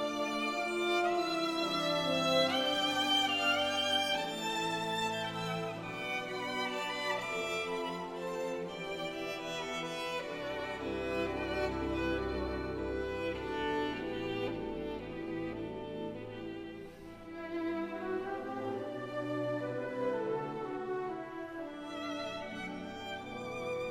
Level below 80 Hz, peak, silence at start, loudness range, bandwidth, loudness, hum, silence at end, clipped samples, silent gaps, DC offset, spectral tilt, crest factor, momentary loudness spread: -56 dBFS; -18 dBFS; 0 s; 10 LU; 16 kHz; -35 LUFS; none; 0 s; under 0.1%; none; under 0.1%; -4 dB/octave; 18 dB; 12 LU